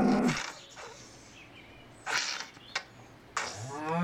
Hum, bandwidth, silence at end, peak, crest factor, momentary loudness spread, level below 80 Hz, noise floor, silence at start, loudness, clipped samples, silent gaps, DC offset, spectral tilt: none; 16 kHz; 0 s; -14 dBFS; 20 dB; 21 LU; -62 dBFS; -53 dBFS; 0 s; -34 LUFS; under 0.1%; none; under 0.1%; -4 dB/octave